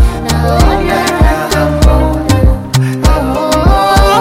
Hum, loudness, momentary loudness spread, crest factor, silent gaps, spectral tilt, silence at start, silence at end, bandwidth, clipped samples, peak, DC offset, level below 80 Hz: none; -10 LUFS; 4 LU; 8 dB; none; -5.5 dB/octave; 0 s; 0 s; 16.5 kHz; under 0.1%; 0 dBFS; under 0.1%; -12 dBFS